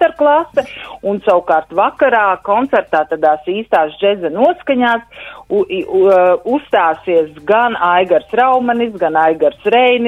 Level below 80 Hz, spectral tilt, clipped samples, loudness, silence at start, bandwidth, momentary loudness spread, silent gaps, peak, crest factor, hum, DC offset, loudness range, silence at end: -52 dBFS; -6.5 dB/octave; under 0.1%; -13 LUFS; 0 s; 8 kHz; 7 LU; none; 0 dBFS; 12 dB; none; under 0.1%; 2 LU; 0 s